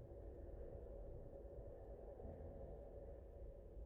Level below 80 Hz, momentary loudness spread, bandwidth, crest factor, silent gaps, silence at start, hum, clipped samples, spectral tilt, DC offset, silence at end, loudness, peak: -58 dBFS; 3 LU; 3.4 kHz; 12 dB; none; 0 s; none; under 0.1%; -9 dB/octave; under 0.1%; 0 s; -57 LUFS; -42 dBFS